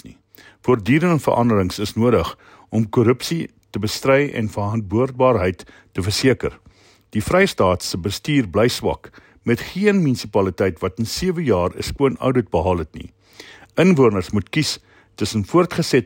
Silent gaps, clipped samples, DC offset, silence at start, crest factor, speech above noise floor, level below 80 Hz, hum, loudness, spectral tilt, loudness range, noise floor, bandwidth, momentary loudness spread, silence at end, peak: none; under 0.1%; under 0.1%; 0.05 s; 16 dB; 33 dB; -44 dBFS; none; -19 LUFS; -6 dB/octave; 1 LU; -51 dBFS; 16.5 kHz; 10 LU; 0 s; -4 dBFS